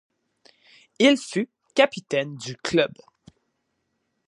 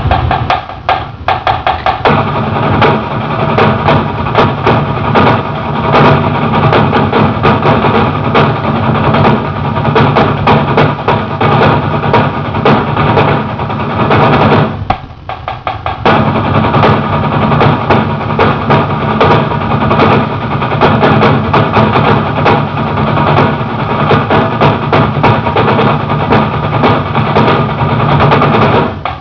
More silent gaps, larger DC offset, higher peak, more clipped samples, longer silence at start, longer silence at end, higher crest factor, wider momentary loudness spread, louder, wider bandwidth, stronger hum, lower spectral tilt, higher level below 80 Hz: neither; second, under 0.1% vs 0.5%; second, -4 dBFS vs 0 dBFS; second, under 0.1% vs 0.9%; first, 1 s vs 0 s; first, 1.4 s vs 0 s; first, 22 dB vs 10 dB; first, 10 LU vs 6 LU; second, -23 LUFS vs -10 LUFS; first, 11.5 kHz vs 5.4 kHz; neither; second, -4 dB/octave vs -8.5 dB/octave; second, -66 dBFS vs -30 dBFS